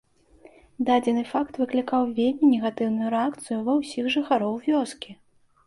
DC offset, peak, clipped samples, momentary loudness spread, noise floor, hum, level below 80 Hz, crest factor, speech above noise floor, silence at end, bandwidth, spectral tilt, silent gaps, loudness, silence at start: under 0.1%; -10 dBFS; under 0.1%; 8 LU; -54 dBFS; none; -64 dBFS; 16 dB; 30 dB; 0.55 s; 11.5 kHz; -5.5 dB/octave; none; -24 LUFS; 0.8 s